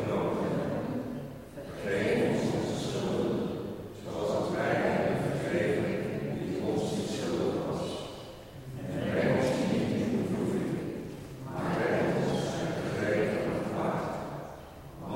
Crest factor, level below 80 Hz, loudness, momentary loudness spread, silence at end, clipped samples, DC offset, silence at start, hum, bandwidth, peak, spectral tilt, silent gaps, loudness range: 14 dB; -56 dBFS; -31 LUFS; 14 LU; 0 s; under 0.1%; under 0.1%; 0 s; none; 16.5 kHz; -16 dBFS; -6.5 dB/octave; none; 2 LU